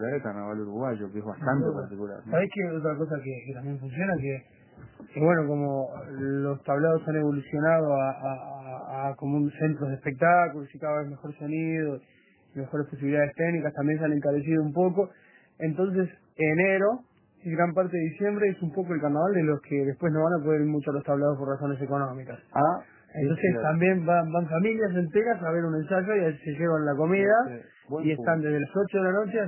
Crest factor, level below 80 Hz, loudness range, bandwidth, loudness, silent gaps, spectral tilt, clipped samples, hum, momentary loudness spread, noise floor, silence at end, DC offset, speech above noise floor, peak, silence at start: 18 dB; -66 dBFS; 4 LU; 3.2 kHz; -27 LUFS; none; -12 dB/octave; under 0.1%; none; 11 LU; -49 dBFS; 0 s; under 0.1%; 22 dB; -8 dBFS; 0 s